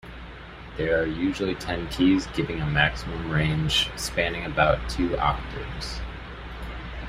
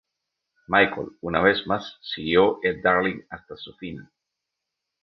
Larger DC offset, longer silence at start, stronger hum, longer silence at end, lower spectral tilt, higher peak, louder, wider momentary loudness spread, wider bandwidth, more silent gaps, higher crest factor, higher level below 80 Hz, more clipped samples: neither; second, 0.05 s vs 0.7 s; neither; second, 0 s vs 1 s; second, -5 dB/octave vs -7 dB/octave; about the same, -4 dBFS vs -4 dBFS; second, -25 LUFS vs -22 LUFS; about the same, 16 LU vs 18 LU; first, 15.5 kHz vs 6.2 kHz; neither; about the same, 24 dB vs 22 dB; first, -38 dBFS vs -54 dBFS; neither